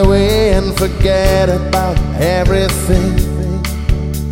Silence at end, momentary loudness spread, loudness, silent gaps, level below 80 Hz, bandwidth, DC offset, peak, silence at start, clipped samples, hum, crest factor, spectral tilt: 0 s; 6 LU; -14 LUFS; none; -18 dBFS; 16.5 kHz; under 0.1%; 0 dBFS; 0 s; under 0.1%; none; 12 dB; -6 dB/octave